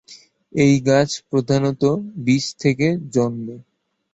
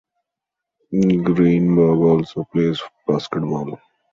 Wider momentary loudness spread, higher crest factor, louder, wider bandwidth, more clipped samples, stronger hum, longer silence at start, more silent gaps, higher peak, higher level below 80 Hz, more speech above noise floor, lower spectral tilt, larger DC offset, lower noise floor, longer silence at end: second, 8 LU vs 11 LU; about the same, 16 dB vs 16 dB; about the same, -19 LUFS vs -18 LUFS; first, 8 kHz vs 7.2 kHz; neither; neither; second, 0.1 s vs 0.9 s; neither; about the same, -2 dBFS vs -4 dBFS; about the same, -56 dBFS vs -52 dBFS; second, 29 dB vs 66 dB; second, -6 dB/octave vs -8.5 dB/octave; neither; second, -47 dBFS vs -83 dBFS; first, 0.5 s vs 0.35 s